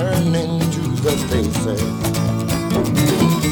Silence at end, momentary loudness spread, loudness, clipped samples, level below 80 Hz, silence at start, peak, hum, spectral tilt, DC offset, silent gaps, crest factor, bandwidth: 0 s; 4 LU; -18 LUFS; under 0.1%; -36 dBFS; 0 s; -2 dBFS; none; -5.5 dB/octave; under 0.1%; none; 16 dB; over 20 kHz